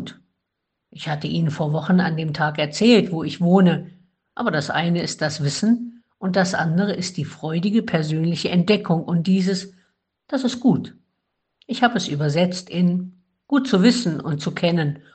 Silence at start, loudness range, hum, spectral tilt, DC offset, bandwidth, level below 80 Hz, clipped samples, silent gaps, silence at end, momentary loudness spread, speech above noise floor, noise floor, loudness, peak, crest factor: 0 s; 3 LU; none; -6 dB/octave; under 0.1%; 9 kHz; -62 dBFS; under 0.1%; none; 0.15 s; 11 LU; 59 dB; -79 dBFS; -21 LUFS; -2 dBFS; 18 dB